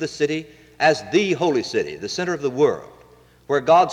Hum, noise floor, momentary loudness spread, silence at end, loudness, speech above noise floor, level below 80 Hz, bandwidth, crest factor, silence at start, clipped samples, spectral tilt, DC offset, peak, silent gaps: none; -51 dBFS; 9 LU; 0 s; -21 LUFS; 31 dB; -58 dBFS; 11.5 kHz; 16 dB; 0 s; under 0.1%; -4.5 dB/octave; under 0.1%; -6 dBFS; none